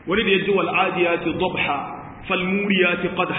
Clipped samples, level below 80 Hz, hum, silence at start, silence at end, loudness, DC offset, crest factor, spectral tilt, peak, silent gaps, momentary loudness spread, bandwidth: under 0.1%; -50 dBFS; none; 0.05 s; 0 s; -20 LUFS; under 0.1%; 16 dB; -10.5 dB/octave; -6 dBFS; none; 7 LU; 4 kHz